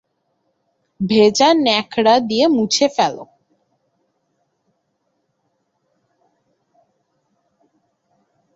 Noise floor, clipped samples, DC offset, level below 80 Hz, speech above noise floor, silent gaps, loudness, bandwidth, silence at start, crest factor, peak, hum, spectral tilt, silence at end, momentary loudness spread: -70 dBFS; under 0.1%; under 0.1%; -62 dBFS; 55 dB; none; -15 LUFS; 8 kHz; 1 s; 20 dB; -2 dBFS; none; -4 dB/octave; 5.3 s; 8 LU